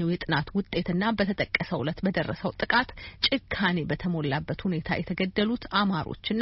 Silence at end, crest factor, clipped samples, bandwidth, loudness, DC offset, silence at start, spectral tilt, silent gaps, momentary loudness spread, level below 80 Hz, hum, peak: 0 s; 20 dB; under 0.1%; 5.8 kHz; -28 LUFS; under 0.1%; 0 s; -4 dB/octave; none; 5 LU; -48 dBFS; none; -8 dBFS